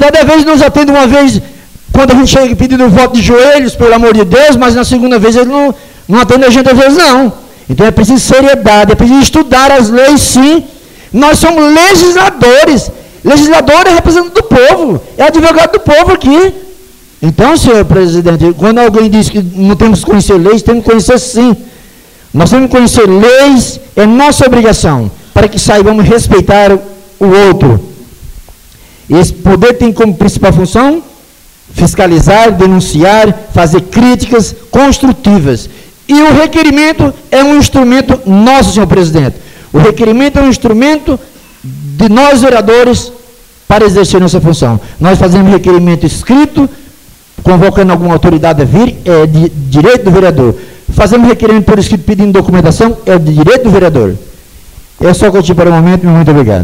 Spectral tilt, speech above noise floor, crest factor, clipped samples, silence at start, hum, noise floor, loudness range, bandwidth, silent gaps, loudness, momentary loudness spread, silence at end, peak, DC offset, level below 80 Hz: -5.5 dB/octave; 33 dB; 6 dB; 1%; 0 s; none; -38 dBFS; 3 LU; 16.5 kHz; none; -5 LUFS; 7 LU; 0 s; 0 dBFS; under 0.1%; -22 dBFS